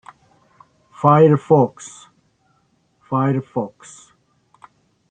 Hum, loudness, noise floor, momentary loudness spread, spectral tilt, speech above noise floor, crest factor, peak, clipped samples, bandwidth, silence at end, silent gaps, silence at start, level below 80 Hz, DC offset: none; -17 LUFS; -63 dBFS; 19 LU; -8 dB/octave; 46 dB; 20 dB; 0 dBFS; under 0.1%; 9.4 kHz; 1.45 s; none; 1 s; -62 dBFS; under 0.1%